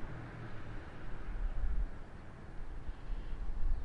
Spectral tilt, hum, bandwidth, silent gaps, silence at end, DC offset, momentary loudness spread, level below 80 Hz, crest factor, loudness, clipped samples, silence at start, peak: -7.5 dB/octave; none; 4.8 kHz; none; 0 s; under 0.1%; 10 LU; -38 dBFS; 14 dB; -46 LUFS; under 0.1%; 0 s; -22 dBFS